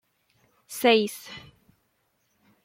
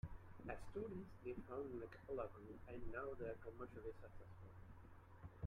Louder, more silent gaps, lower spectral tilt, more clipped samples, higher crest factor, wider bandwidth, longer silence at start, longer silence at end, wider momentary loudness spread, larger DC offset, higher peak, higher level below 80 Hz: first, -23 LUFS vs -53 LUFS; neither; second, -3 dB/octave vs -8.5 dB/octave; neither; first, 22 dB vs 16 dB; first, 16.5 kHz vs 13 kHz; first, 0.7 s vs 0.05 s; first, 1.25 s vs 0 s; first, 22 LU vs 12 LU; neither; first, -6 dBFS vs -36 dBFS; second, -72 dBFS vs -64 dBFS